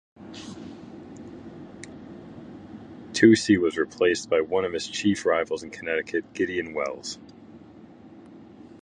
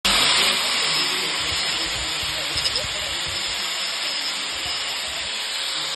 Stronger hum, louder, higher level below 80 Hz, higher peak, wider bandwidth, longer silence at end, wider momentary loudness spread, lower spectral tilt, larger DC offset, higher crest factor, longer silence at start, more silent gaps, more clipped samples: neither; second, -24 LUFS vs -21 LUFS; second, -58 dBFS vs -46 dBFS; about the same, -4 dBFS vs -6 dBFS; second, 10.5 kHz vs 12.5 kHz; about the same, 0.05 s vs 0 s; first, 23 LU vs 8 LU; first, -4.5 dB/octave vs 0 dB/octave; neither; first, 24 dB vs 18 dB; first, 0.2 s vs 0.05 s; neither; neither